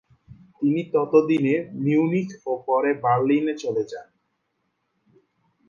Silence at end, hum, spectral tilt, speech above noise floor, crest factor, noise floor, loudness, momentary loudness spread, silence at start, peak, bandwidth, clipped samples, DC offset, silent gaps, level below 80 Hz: 1.65 s; none; -8 dB/octave; 52 dB; 18 dB; -74 dBFS; -22 LUFS; 10 LU; 0.3 s; -4 dBFS; 7.2 kHz; under 0.1%; under 0.1%; none; -70 dBFS